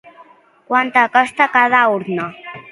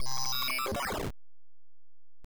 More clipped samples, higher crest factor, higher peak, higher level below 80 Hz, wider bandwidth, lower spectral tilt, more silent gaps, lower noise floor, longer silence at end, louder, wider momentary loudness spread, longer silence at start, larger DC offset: neither; first, 16 dB vs 8 dB; first, 0 dBFS vs -24 dBFS; second, -66 dBFS vs -52 dBFS; second, 11.5 kHz vs over 20 kHz; first, -5 dB/octave vs -2 dB/octave; neither; second, -47 dBFS vs under -90 dBFS; about the same, 0.1 s vs 0 s; first, -14 LUFS vs -32 LUFS; first, 12 LU vs 7 LU; first, 0.7 s vs 0 s; neither